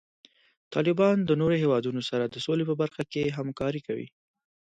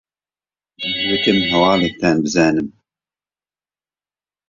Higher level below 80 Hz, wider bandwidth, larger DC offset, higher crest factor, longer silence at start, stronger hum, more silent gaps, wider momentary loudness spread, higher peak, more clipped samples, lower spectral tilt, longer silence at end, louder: second, -62 dBFS vs -50 dBFS; first, 9.2 kHz vs 7.6 kHz; neither; about the same, 16 dB vs 18 dB; about the same, 0.7 s vs 0.8 s; neither; neither; about the same, 10 LU vs 9 LU; second, -12 dBFS vs -2 dBFS; neither; first, -7 dB/octave vs -4.5 dB/octave; second, 0.7 s vs 1.8 s; second, -27 LUFS vs -16 LUFS